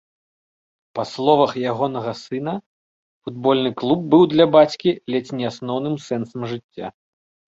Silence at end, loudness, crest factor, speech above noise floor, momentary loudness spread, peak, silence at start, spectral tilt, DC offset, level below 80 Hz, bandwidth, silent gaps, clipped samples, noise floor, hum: 0.65 s; -20 LUFS; 18 dB; over 71 dB; 18 LU; -2 dBFS; 0.95 s; -7 dB/octave; under 0.1%; -62 dBFS; 7.8 kHz; 2.66-3.22 s, 6.64-6.69 s; under 0.1%; under -90 dBFS; none